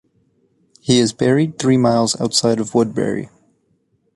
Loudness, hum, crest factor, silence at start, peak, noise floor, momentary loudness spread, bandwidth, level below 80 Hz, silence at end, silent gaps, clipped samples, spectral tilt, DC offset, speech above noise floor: -17 LUFS; none; 16 dB; 0.85 s; -2 dBFS; -63 dBFS; 9 LU; 11.5 kHz; -54 dBFS; 0.9 s; none; under 0.1%; -5 dB/octave; under 0.1%; 47 dB